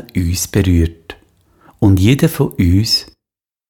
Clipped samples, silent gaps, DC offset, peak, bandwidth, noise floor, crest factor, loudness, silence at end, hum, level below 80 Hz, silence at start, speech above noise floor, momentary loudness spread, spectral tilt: under 0.1%; none; under 0.1%; 0 dBFS; 18.5 kHz; -86 dBFS; 14 dB; -14 LUFS; 0.65 s; none; -30 dBFS; 0.15 s; 73 dB; 6 LU; -5.5 dB/octave